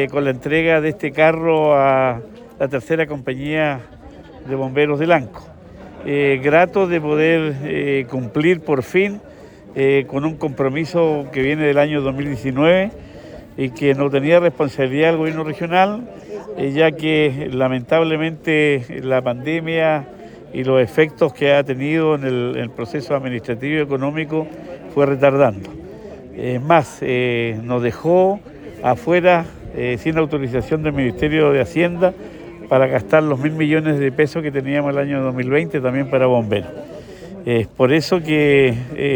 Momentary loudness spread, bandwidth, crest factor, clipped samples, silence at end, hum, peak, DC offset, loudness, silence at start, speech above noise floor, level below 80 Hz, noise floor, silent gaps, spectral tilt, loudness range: 13 LU; over 20 kHz; 16 dB; under 0.1%; 0 s; none; -2 dBFS; under 0.1%; -18 LUFS; 0 s; 20 dB; -48 dBFS; -37 dBFS; none; -7 dB/octave; 2 LU